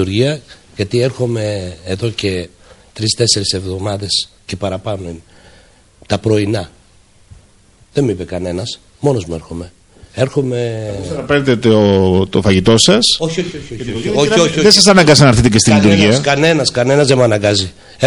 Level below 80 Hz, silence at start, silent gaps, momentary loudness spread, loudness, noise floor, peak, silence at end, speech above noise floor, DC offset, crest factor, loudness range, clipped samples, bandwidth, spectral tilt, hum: -38 dBFS; 0 s; none; 16 LU; -13 LUFS; -47 dBFS; 0 dBFS; 0 s; 35 dB; under 0.1%; 14 dB; 12 LU; under 0.1%; 16.5 kHz; -4.5 dB/octave; none